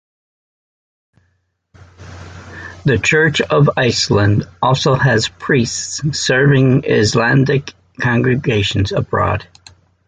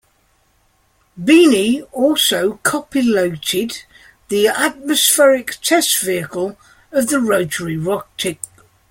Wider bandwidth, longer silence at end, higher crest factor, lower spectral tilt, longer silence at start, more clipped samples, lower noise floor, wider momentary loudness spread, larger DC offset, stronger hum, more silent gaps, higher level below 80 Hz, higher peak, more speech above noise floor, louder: second, 9.4 kHz vs 16.5 kHz; about the same, 0.65 s vs 0.55 s; about the same, 14 dB vs 16 dB; first, -5 dB/octave vs -3 dB/octave; first, 2 s vs 1.15 s; neither; first, -64 dBFS vs -59 dBFS; second, 10 LU vs 13 LU; neither; neither; neither; first, -38 dBFS vs -56 dBFS; about the same, -2 dBFS vs 0 dBFS; first, 50 dB vs 43 dB; about the same, -14 LUFS vs -16 LUFS